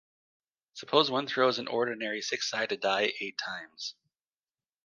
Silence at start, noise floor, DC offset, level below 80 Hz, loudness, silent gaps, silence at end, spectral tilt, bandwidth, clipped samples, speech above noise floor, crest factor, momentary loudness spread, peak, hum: 0.75 s; under -90 dBFS; under 0.1%; -82 dBFS; -30 LUFS; none; 0.95 s; -3 dB/octave; 10 kHz; under 0.1%; over 60 dB; 26 dB; 14 LU; -6 dBFS; none